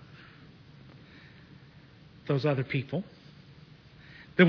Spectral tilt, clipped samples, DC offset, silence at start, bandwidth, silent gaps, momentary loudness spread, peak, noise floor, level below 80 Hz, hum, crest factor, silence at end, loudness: -8.5 dB/octave; under 0.1%; under 0.1%; 2.25 s; 5.4 kHz; none; 25 LU; -8 dBFS; -54 dBFS; -66 dBFS; none; 24 dB; 0 s; -31 LUFS